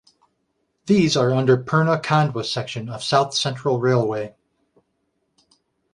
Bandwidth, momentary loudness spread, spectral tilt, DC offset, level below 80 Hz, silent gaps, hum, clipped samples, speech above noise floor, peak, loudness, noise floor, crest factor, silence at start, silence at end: 11 kHz; 11 LU; -5.5 dB/octave; under 0.1%; -60 dBFS; none; none; under 0.1%; 52 dB; -2 dBFS; -20 LUFS; -72 dBFS; 20 dB; 0.85 s; 1.65 s